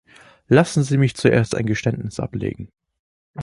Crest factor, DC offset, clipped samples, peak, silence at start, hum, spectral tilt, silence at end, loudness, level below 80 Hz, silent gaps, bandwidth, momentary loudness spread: 20 dB; under 0.1%; under 0.1%; -2 dBFS; 0.5 s; none; -6.5 dB/octave; 0 s; -20 LUFS; -48 dBFS; 2.99-3.34 s; 11.5 kHz; 16 LU